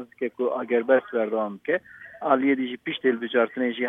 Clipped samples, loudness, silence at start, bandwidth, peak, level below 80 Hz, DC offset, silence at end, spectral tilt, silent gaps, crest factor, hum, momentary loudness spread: under 0.1%; -25 LUFS; 0 s; 3.9 kHz; -6 dBFS; -78 dBFS; under 0.1%; 0 s; -7.5 dB/octave; none; 18 dB; none; 8 LU